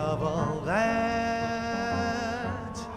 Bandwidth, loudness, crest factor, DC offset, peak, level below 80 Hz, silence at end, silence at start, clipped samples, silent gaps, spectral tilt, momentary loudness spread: 13 kHz; -29 LUFS; 14 dB; under 0.1%; -14 dBFS; -48 dBFS; 0 s; 0 s; under 0.1%; none; -5.5 dB/octave; 6 LU